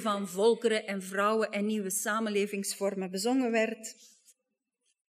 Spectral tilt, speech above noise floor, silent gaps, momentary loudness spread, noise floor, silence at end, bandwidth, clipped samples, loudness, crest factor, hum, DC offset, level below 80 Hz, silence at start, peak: -4 dB/octave; 54 dB; none; 6 LU; -85 dBFS; 1.05 s; 15.5 kHz; under 0.1%; -30 LUFS; 18 dB; none; under 0.1%; under -90 dBFS; 0 s; -14 dBFS